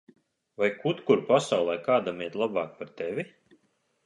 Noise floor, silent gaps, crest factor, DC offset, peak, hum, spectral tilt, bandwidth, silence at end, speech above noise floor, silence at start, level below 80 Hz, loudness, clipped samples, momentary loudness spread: -71 dBFS; none; 22 dB; under 0.1%; -6 dBFS; none; -5.5 dB/octave; 11.5 kHz; 0.8 s; 44 dB; 0.6 s; -74 dBFS; -28 LUFS; under 0.1%; 13 LU